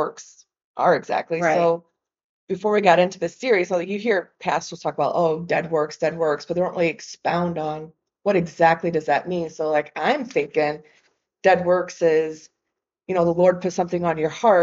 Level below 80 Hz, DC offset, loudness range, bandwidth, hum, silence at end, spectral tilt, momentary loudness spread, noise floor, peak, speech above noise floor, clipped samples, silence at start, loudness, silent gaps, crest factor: -64 dBFS; under 0.1%; 2 LU; 7.8 kHz; none; 0 s; -4.5 dB/octave; 10 LU; -82 dBFS; -2 dBFS; 61 dB; under 0.1%; 0 s; -22 LUFS; 0.64-0.74 s, 2.24-2.47 s; 18 dB